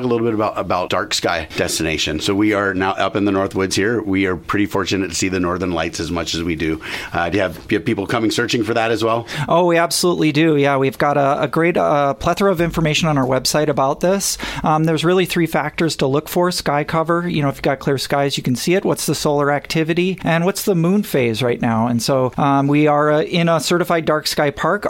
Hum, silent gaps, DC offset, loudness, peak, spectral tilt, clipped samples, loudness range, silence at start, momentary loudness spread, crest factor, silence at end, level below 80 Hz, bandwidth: none; none; under 0.1%; -17 LUFS; -2 dBFS; -5 dB/octave; under 0.1%; 3 LU; 0 s; 5 LU; 16 dB; 0 s; -44 dBFS; 16.5 kHz